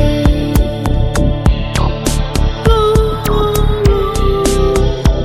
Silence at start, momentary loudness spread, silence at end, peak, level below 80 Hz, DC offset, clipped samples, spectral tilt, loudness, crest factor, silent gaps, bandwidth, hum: 0 s; 4 LU; 0 s; 0 dBFS; -16 dBFS; under 0.1%; under 0.1%; -6 dB/octave; -14 LUFS; 12 dB; none; 16.5 kHz; none